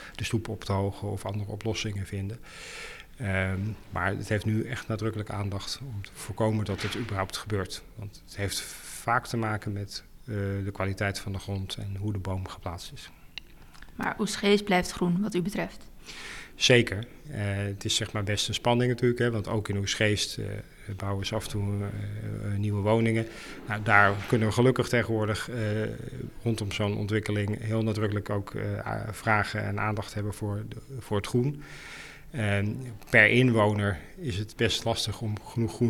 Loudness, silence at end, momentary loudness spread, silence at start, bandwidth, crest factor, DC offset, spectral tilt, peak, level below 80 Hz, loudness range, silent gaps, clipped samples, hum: -28 LUFS; 0 s; 16 LU; 0 s; 15.5 kHz; 26 dB; under 0.1%; -5 dB/octave; -4 dBFS; -50 dBFS; 7 LU; none; under 0.1%; none